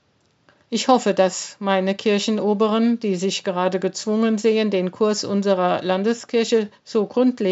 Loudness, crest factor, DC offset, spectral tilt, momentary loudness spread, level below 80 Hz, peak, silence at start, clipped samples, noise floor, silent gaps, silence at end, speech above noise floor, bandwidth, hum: -20 LUFS; 18 dB; under 0.1%; -4.5 dB/octave; 4 LU; -78 dBFS; -2 dBFS; 0.7 s; under 0.1%; -60 dBFS; none; 0 s; 40 dB; 8 kHz; none